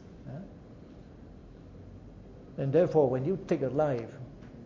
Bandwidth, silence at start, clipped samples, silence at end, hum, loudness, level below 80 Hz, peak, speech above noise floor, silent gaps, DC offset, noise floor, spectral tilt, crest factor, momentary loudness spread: 7.4 kHz; 0 s; under 0.1%; 0 s; none; -29 LUFS; -56 dBFS; -12 dBFS; 22 dB; none; under 0.1%; -50 dBFS; -9 dB/octave; 20 dB; 25 LU